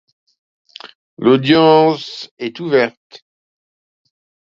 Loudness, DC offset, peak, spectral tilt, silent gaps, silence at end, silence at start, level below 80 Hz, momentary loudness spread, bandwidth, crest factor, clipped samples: -14 LUFS; under 0.1%; 0 dBFS; -7 dB/octave; 2.31-2.37 s; 1.6 s; 1.2 s; -62 dBFS; 25 LU; 7.4 kHz; 18 dB; under 0.1%